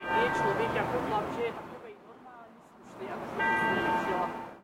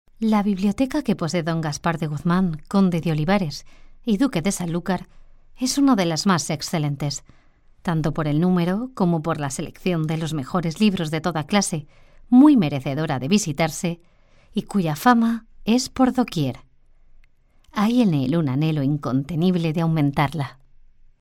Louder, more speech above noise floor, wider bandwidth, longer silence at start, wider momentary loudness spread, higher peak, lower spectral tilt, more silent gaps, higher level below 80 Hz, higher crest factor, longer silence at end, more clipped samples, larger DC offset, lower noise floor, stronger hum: second, -30 LUFS vs -22 LUFS; second, 22 dB vs 33 dB; about the same, 16.5 kHz vs 16.5 kHz; second, 0 s vs 0.2 s; first, 23 LU vs 10 LU; second, -16 dBFS vs -4 dBFS; about the same, -5.5 dB/octave vs -6 dB/octave; neither; second, -60 dBFS vs -46 dBFS; about the same, 16 dB vs 18 dB; second, 0 s vs 0.7 s; neither; neither; about the same, -52 dBFS vs -53 dBFS; neither